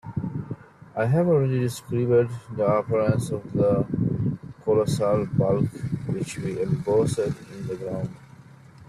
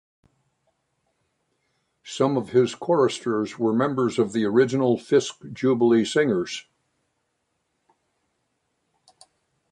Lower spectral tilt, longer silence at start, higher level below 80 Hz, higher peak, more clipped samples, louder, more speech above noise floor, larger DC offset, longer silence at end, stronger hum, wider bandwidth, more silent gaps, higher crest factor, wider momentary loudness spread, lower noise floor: first, -7.5 dB/octave vs -5.5 dB/octave; second, 0.05 s vs 2.05 s; first, -52 dBFS vs -68 dBFS; about the same, -8 dBFS vs -6 dBFS; neither; second, -25 LUFS vs -22 LUFS; second, 25 dB vs 53 dB; neither; second, 0.05 s vs 3.1 s; neither; first, 13.5 kHz vs 10.5 kHz; neither; about the same, 16 dB vs 18 dB; first, 11 LU vs 7 LU; second, -48 dBFS vs -75 dBFS